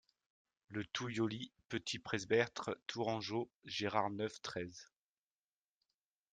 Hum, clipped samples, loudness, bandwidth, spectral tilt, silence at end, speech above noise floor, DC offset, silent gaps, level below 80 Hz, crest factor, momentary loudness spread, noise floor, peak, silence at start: none; under 0.1%; -40 LUFS; 9.6 kHz; -4.5 dB/octave; 1.5 s; over 50 dB; under 0.1%; 3.56-3.60 s; -78 dBFS; 24 dB; 11 LU; under -90 dBFS; -18 dBFS; 0.7 s